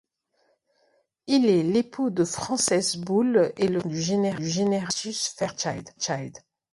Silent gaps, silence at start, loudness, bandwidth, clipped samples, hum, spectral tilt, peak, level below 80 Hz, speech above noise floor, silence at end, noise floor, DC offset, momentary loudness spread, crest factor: none; 1.25 s; -25 LUFS; 11.5 kHz; under 0.1%; none; -4.5 dB/octave; -10 dBFS; -64 dBFS; 45 dB; 0.35 s; -70 dBFS; under 0.1%; 9 LU; 16 dB